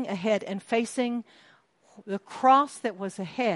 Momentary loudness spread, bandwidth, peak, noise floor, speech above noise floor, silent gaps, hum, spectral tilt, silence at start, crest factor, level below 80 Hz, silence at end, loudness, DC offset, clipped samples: 15 LU; 11.5 kHz; -8 dBFS; -60 dBFS; 33 dB; none; none; -5 dB/octave; 0 s; 18 dB; -78 dBFS; 0 s; -27 LUFS; under 0.1%; under 0.1%